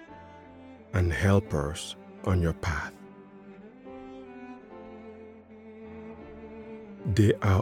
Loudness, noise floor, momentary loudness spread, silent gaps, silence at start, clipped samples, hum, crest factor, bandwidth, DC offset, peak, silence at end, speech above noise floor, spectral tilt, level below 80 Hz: -28 LUFS; -49 dBFS; 25 LU; none; 0 s; under 0.1%; none; 22 dB; 14 kHz; under 0.1%; -8 dBFS; 0 s; 24 dB; -6.5 dB/octave; -46 dBFS